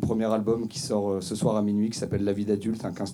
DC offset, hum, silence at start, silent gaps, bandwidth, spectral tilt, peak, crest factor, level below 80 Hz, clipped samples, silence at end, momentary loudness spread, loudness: under 0.1%; none; 0 s; none; 13.5 kHz; -6.5 dB/octave; -10 dBFS; 16 dB; -56 dBFS; under 0.1%; 0 s; 4 LU; -27 LUFS